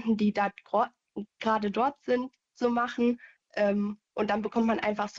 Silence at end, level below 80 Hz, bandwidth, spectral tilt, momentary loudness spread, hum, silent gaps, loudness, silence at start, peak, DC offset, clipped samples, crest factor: 0 s; -66 dBFS; 7.6 kHz; -6.5 dB/octave; 8 LU; none; none; -29 LUFS; 0 s; -14 dBFS; under 0.1%; under 0.1%; 16 dB